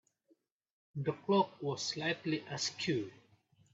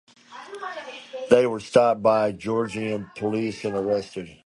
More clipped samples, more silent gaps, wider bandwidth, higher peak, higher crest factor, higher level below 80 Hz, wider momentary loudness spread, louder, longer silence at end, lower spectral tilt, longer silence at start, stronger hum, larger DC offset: neither; neither; second, 8 kHz vs 11.5 kHz; second, -18 dBFS vs -2 dBFS; about the same, 20 dB vs 22 dB; second, -78 dBFS vs -60 dBFS; second, 8 LU vs 17 LU; second, -36 LUFS vs -23 LUFS; first, 0.6 s vs 0.15 s; second, -4.5 dB/octave vs -6 dB/octave; first, 0.95 s vs 0.3 s; neither; neither